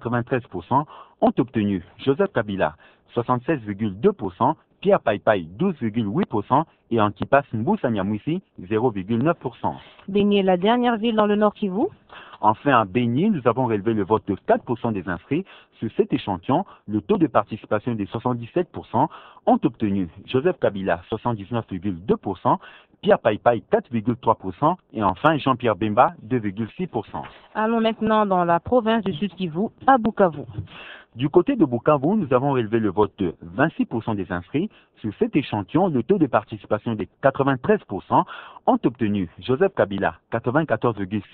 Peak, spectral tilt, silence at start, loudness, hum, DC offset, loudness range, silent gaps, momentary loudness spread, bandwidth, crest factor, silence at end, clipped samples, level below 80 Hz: 0 dBFS; -10.5 dB/octave; 0 s; -22 LUFS; none; under 0.1%; 3 LU; none; 9 LU; 4.3 kHz; 22 dB; 0.1 s; under 0.1%; -54 dBFS